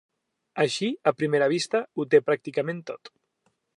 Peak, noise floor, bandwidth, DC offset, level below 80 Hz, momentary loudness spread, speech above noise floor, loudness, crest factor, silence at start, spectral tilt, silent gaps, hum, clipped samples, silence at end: -6 dBFS; -73 dBFS; 11 kHz; under 0.1%; -80 dBFS; 15 LU; 48 dB; -25 LUFS; 20 dB; 0.55 s; -5 dB/octave; none; none; under 0.1%; 0.7 s